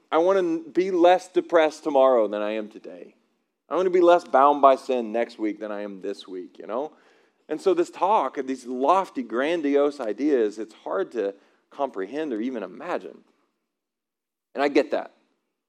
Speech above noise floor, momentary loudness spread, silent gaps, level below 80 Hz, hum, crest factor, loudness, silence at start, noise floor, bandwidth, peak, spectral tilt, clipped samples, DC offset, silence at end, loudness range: 65 dB; 15 LU; none; under -90 dBFS; none; 22 dB; -23 LUFS; 0.1 s; -88 dBFS; 10.5 kHz; -2 dBFS; -5 dB/octave; under 0.1%; under 0.1%; 0.6 s; 9 LU